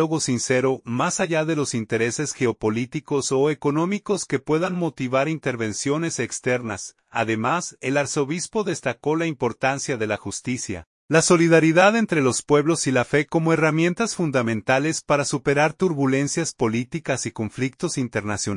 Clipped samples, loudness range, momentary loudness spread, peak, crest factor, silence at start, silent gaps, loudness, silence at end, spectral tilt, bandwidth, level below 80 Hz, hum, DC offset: under 0.1%; 5 LU; 7 LU; -4 dBFS; 18 dB; 0 s; 10.87-11.08 s; -22 LUFS; 0 s; -4.5 dB/octave; 11 kHz; -58 dBFS; none; under 0.1%